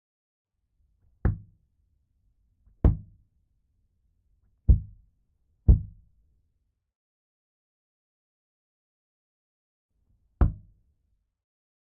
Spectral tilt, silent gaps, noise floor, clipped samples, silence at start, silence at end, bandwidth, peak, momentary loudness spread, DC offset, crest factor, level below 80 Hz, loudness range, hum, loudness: -10.5 dB/octave; 6.95-9.89 s; -76 dBFS; under 0.1%; 1.25 s; 1.4 s; 2.1 kHz; -8 dBFS; 18 LU; under 0.1%; 24 dB; -34 dBFS; 7 LU; none; -27 LUFS